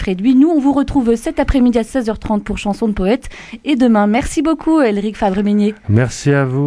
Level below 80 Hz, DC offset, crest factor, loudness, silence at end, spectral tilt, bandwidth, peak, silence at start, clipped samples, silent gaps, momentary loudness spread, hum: -32 dBFS; under 0.1%; 12 dB; -15 LUFS; 0 s; -7 dB/octave; 11 kHz; -2 dBFS; 0 s; under 0.1%; none; 8 LU; none